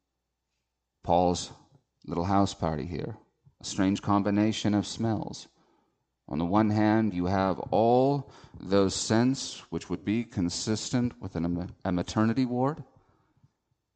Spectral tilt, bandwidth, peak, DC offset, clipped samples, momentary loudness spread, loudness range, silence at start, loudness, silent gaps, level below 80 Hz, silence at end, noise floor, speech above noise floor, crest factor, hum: -5.5 dB/octave; 9.2 kHz; -10 dBFS; under 0.1%; under 0.1%; 13 LU; 4 LU; 1.05 s; -28 LUFS; none; -56 dBFS; 1.15 s; -83 dBFS; 56 dB; 18 dB; none